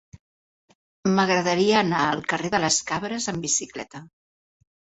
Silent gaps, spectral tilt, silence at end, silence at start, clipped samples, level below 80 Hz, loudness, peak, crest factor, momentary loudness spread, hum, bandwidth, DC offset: none; -3.5 dB/octave; 0.9 s; 1.05 s; under 0.1%; -60 dBFS; -22 LUFS; -4 dBFS; 20 dB; 14 LU; none; 8.4 kHz; under 0.1%